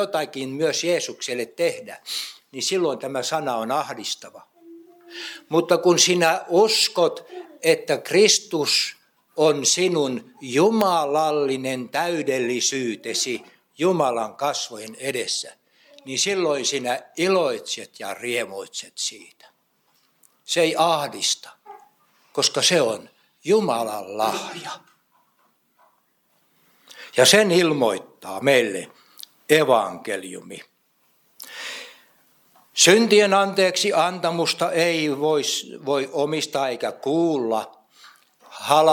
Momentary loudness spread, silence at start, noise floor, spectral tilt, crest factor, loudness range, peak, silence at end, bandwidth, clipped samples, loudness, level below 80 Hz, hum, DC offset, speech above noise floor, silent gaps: 16 LU; 0 s; -66 dBFS; -2.5 dB/octave; 20 dB; 7 LU; -2 dBFS; 0 s; 19 kHz; under 0.1%; -21 LUFS; -78 dBFS; none; under 0.1%; 44 dB; none